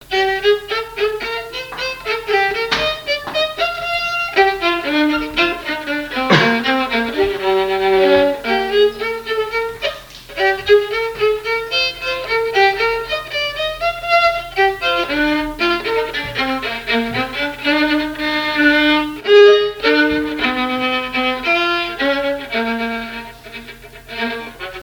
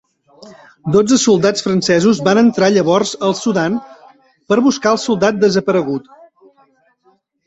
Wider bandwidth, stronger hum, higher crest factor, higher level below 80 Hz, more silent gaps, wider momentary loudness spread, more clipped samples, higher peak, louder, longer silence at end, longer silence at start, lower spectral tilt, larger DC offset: first, 19.5 kHz vs 8.2 kHz; neither; about the same, 18 dB vs 14 dB; first, -44 dBFS vs -54 dBFS; neither; first, 10 LU vs 6 LU; neither; about the same, 0 dBFS vs 0 dBFS; about the same, -16 LUFS vs -14 LUFS; second, 0 s vs 1.5 s; second, 0 s vs 0.4 s; about the same, -4.5 dB/octave vs -5 dB/octave; neither